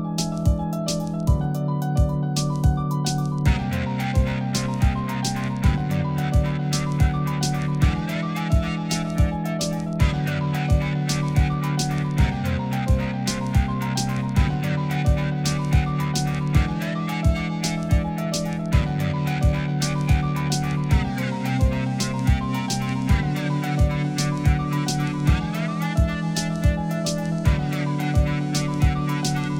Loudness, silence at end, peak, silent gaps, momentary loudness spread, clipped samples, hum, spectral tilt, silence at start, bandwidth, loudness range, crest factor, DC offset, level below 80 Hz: -23 LUFS; 0 s; -6 dBFS; none; 3 LU; under 0.1%; none; -6 dB/octave; 0 s; 17 kHz; 1 LU; 16 dB; under 0.1%; -28 dBFS